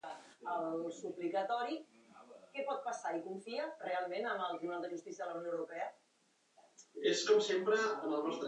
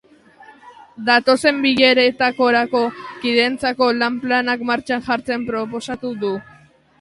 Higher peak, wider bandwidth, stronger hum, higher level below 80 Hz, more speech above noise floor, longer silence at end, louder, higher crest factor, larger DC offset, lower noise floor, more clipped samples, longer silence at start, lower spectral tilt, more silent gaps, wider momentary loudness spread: second, -18 dBFS vs 0 dBFS; second, 9.6 kHz vs 11.5 kHz; neither; second, under -90 dBFS vs -58 dBFS; first, 37 dB vs 32 dB; second, 0 s vs 0.6 s; second, -38 LUFS vs -18 LUFS; about the same, 20 dB vs 18 dB; neither; first, -75 dBFS vs -50 dBFS; neither; second, 0.05 s vs 0.4 s; about the same, -3 dB/octave vs -4 dB/octave; neither; about the same, 14 LU vs 12 LU